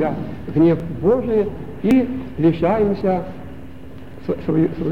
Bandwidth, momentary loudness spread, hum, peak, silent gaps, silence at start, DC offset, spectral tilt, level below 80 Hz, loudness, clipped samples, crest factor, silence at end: 8 kHz; 20 LU; none; -4 dBFS; none; 0 s; 2%; -9.5 dB/octave; -42 dBFS; -19 LUFS; under 0.1%; 14 dB; 0 s